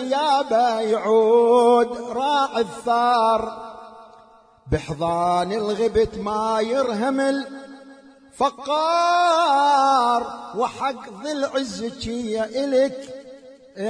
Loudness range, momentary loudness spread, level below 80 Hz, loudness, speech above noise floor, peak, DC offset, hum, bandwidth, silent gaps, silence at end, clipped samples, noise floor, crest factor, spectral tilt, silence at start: 5 LU; 13 LU; -48 dBFS; -20 LUFS; 31 dB; -6 dBFS; under 0.1%; none; 10.5 kHz; none; 0 s; under 0.1%; -51 dBFS; 14 dB; -4.5 dB/octave; 0 s